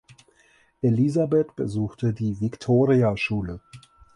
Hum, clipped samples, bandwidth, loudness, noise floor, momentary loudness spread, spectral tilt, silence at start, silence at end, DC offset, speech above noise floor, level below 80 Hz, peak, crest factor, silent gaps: none; under 0.1%; 10.5 kHz; -23 LUFS; -60 dBFS; 9 LU; -8 dB/octave; 0.85 s; 0.35 s; under 0.1%; 38 dB; -52 dBFS; -8 dBFS; 16 dB; none